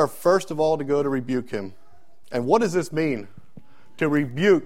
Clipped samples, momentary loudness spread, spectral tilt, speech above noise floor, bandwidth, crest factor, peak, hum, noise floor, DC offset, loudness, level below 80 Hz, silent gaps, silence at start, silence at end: under 0.1%; 11 LU; -6 dB/octave; 37 dB; 16 kHz; 18 dB; -4 dBFS; none; -59 dBFS; 1%; -23 LUFS; -60 dBFS; none; 0 s; 0 s